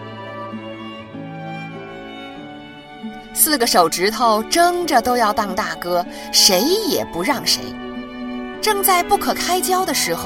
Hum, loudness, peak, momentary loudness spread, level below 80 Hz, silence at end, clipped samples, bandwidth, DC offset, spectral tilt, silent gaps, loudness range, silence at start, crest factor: none; -17 LUFS; 0 dBFS; 19 LU; -48 dBFS; 0 s; under 0.1%; 17 kHz; under 0.1%; -2 dB/octave; none; 6 LU; 0 s; 20 dB